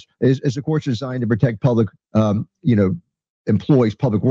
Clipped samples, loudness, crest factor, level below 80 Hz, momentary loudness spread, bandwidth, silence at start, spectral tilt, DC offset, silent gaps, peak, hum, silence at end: under 0.1%; -19 LUFS; 14 dB; -54 dBFS; 6 LU; 7.4 kHz; 0.2 s; -8.5 dB/octave; under 0.1%; 3.29-3.45 s; -4 dBFS; none; 0 s